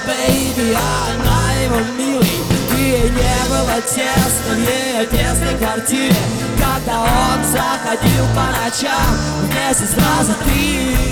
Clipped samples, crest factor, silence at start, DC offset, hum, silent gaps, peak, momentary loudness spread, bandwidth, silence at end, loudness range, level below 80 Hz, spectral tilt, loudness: under 0.1%; 14 dB; 0 s; under 0.1%; none; none; -2 dBFS; 3 LU; over 20 kHz; 0 s; 1 LU; -24 dBFS; -4 dB/octave; -15 LUFS